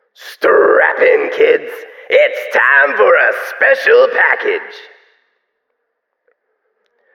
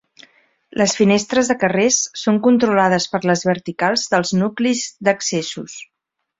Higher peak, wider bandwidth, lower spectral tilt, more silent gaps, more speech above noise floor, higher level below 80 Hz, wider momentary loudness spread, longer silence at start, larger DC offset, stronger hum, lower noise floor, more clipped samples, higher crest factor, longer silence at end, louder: about the same, 0 dBFS vs -2 dBFS; first, 15.5 kHz vs 8 kHz; about the same, -3 dB/octave vs -4 dB/octave; neither; first, 59 dB vs 35 dB; second, -68 dBFS vs -58 dBFS; about the same, 9 LU vs 8 LU; second, 0.2 s vs 0.75 s; neither; neither; first, -71 dBFS vs -52 dBFS; neither; about the same, 14 dB vs 16 dB; first, 2.35 s vs 0.55 s; first, -11 LUFS vs -17 LUFS